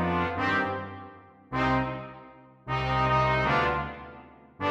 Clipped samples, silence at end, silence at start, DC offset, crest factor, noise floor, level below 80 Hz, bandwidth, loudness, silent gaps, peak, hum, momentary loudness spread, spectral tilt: under 0.1%; 0 s; 0 s; under 0.1%; 16 dB; -50 dBFS; -46 dBFS; 8 kHz; -27 LUFS; none; -12 dBFS; none; 21 LU; -7 dB/octave